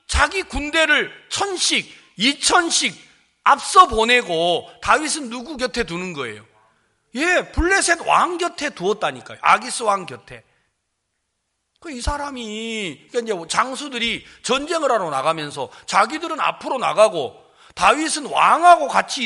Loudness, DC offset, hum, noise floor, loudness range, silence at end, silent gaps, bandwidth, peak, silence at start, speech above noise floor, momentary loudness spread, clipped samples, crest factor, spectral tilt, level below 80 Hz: -19 LUFS; under 0.1%; none; -74 dBFS; 8 LU; 0 s; none; 11.5 kHz; 0 dBFS; 0.1 s; 55 dB; 13 LU; under 0.1%; 20 dB; -2 dB/octave; -40 dBFS